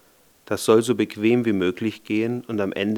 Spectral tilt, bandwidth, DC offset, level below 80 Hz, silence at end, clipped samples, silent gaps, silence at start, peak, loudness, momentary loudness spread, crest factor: -5.5 dB/octave; 19 kHz; under 0.1%; -68 dBFS; 0 s; under 0.1%; none; 0.5 s; -4 dBFS; -22 LUFS; 8 LU; 18 dB